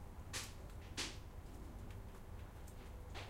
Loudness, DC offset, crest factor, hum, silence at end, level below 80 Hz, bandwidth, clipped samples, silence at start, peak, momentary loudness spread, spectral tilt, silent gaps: -50 LUFS; under 0.1%; 20 dB; none; 0 s; -54 dBFS; 16 kHz; under 0.1%; 0 s; -30 dBFS; 9 LU; -3 dB/octave; none